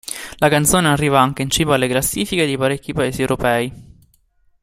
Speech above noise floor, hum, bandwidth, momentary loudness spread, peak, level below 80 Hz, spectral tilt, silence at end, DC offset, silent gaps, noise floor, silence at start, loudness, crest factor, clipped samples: 41 dB; none; 16 kHz; 7 LU; 0 dBFS; -42 dBFS; -4 dB/octave; 0.8 s; under 0.1%; none; -58 dBFS; 0.05 s; -17 LUFS; 18 dB; under 0.1%